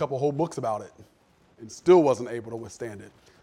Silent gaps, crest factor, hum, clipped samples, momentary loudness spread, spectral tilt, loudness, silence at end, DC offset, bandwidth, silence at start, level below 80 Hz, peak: none; 20 dB; none; under 0.1%; 23 LU; -6.5 dB/octave; -25 LUFS; 0.35 s; under 0.1%; 10.5 kHz; 0 s; -66 dBFS; -6 dBFS